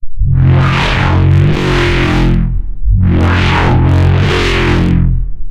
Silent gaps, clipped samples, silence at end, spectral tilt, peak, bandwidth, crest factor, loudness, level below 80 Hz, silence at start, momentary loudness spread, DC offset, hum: none; under 0.1%; 0 s; -7 dB/octave; 0 dBFS; 9.4 kHz; 10 dB; -11 LUFS; -16 dBFS; 0 s; 6 LU; under 0.1%; none